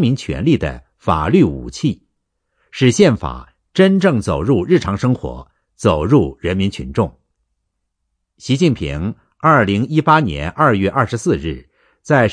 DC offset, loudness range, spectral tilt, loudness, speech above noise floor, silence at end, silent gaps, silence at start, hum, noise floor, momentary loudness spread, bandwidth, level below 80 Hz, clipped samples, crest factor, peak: under 0.1%; 4 LU; -6.5 dB/octave; -16 LUFS; 57 dB; 0 s; none; 0 s; none; -72 dBFS; 12 LU; 10.5 kHz; -36 dBFS; under 0.1%; 16 dB; 0 dBFS